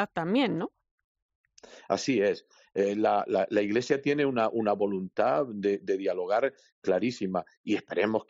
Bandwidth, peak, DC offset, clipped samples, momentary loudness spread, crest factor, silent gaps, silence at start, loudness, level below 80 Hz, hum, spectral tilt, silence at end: 7.6 kHz; -12 dBFS; under 0.1%; under 0.1%; 7 LU; 18 dB; 0.91-0.98 s, 1.04-1.15 s, 1.22-1.29 s, 1.35-1.44 s, 6.72-6.82 s, 7.57-7.64 s; 0 s; -28 LUFS; -74 dBFS; none; -4.5 dB/octave; 0.05 s